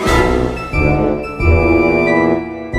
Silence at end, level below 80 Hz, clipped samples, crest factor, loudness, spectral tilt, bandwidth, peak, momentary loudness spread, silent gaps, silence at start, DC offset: 0 s; -22 dBFS; under 0.1%; 14 dB; -14 LUFS; -7 dB/octave; 14.5 kHz; 0 dBFS; 6 LU; none; 0 s; under 0.1%